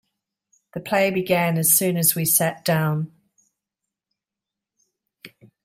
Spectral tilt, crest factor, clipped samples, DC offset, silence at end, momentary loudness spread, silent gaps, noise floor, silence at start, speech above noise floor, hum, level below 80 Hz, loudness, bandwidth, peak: -4 dB/octave; 20 dB; under 0.1%; under 0.1%; 0.35 s; 14 LU; none; -87 dBFS; 0.75 s; 67 dB; none; -66 dBFS; -19 LUFS; 16 kHz; -4 dBFS